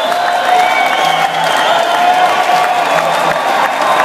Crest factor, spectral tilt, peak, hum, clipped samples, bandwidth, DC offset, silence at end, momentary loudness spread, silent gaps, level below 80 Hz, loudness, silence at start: 12 dB; -2 dB/octave; 0 dBFS; none; under 0.1%; 16 kHz; under 0.1%; 0 s; 2 LU; none; -58 dBFS; -11 LUFS; 0 s